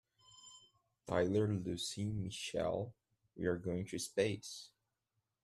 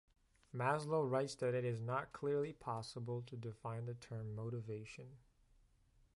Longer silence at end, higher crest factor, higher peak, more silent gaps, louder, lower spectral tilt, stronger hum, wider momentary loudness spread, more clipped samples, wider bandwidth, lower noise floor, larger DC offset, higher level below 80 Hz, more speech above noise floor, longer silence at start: second, 0.75 s vs 1 s; about the same, 20 dB vs 20 dB; about the same, -20 dBFS vs -22 dBFS; neither; first, -39 LUFS vs -42 LUFS; second, -5 dB/octave vs -6.5 dB/octave; neither; first, 22 LU vs 12 LU; neither; first, 13.5 kHz vs 11.5 kHz; first, -87 dBFS vs -72 dBFS; neither; about the same, -68 dBFS vs -72 dBFS; first, 49 dB vs 30 dB; second, 0.35 s vs 0.55 s